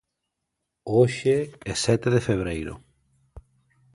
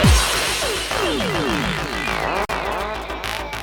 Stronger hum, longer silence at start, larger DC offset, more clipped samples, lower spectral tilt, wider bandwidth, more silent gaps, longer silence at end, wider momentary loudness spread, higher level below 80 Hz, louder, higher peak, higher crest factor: neither; first, 0.85 s vs 0 s; neither; neither; first, -5.5 dB/octave vs -3.5 dB/octave; second, 11.5 kHz vs 17.5 kHz; neither; first, 0.55 s vs 0 s; first, 16 LU vs 8 LU; second, -48 dBFS vs -28 dBFS; second, -24 LUFS vs -21 LUFS; second, -6 dBFS vs -2 dBFS; about the same, 20 dB vs 18 dB